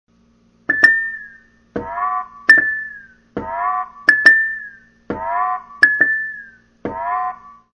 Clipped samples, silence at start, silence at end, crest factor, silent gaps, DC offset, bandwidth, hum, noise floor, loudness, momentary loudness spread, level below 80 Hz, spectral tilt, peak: under 0.1%; 0.7 s; 0.2 s; 18 dB; none; under 0.1%; 10.5 kHz; none; -55 dBFS; -15 LUFS; 20 LU; -54 dBFS; -3.5 dB/octave; 0 dBFS